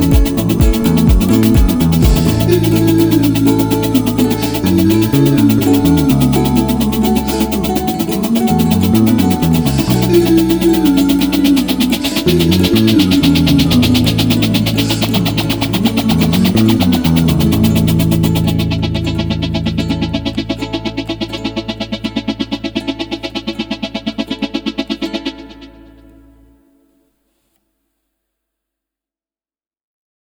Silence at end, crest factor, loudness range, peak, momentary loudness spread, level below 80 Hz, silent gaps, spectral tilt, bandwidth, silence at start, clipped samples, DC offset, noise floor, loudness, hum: 4.6 s; 12 dB; 10 LU; 0 dBFS; 10 LU; -24 dBFS; none; -6 dB/octave; over 20 kHz; 0 s; under 0.1%; under 0.1%; under -90 dBFS; -13 LUFS; none